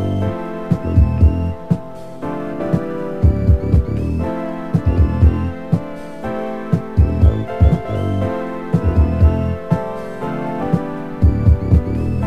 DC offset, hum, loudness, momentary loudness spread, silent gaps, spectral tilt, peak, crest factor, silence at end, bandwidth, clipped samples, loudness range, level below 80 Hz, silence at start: 2%; none; -18 LUFS; 10 LU; none; -10 dB/octave; 0 dBFS; 16 dB; 0 s; 5.6 kHz; under 0.1%; 2 LU; -20 dBFS; 0 s